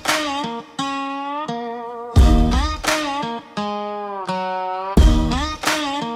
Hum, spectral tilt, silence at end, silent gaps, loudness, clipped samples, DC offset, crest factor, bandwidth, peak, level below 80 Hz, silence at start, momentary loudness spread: none; -5 dB/octave; 0 s; none; -21 LUFS; under 0.1%; under 0.1%; 16 dB; 15.5 kHz; -2 dBFS; -22 dBFS; 0 s; 11 LU